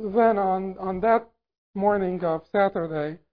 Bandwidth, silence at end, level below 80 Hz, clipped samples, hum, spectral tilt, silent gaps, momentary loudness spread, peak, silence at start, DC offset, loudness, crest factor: 5 kHz; 0.15 s; -56 dBFS; under 0.1%; none; -10.5 dB/octave; 1.58-1.74 s; 9 LU; -6 dBFS; 0 s; 0.1%; -24 LUFS; 18 dB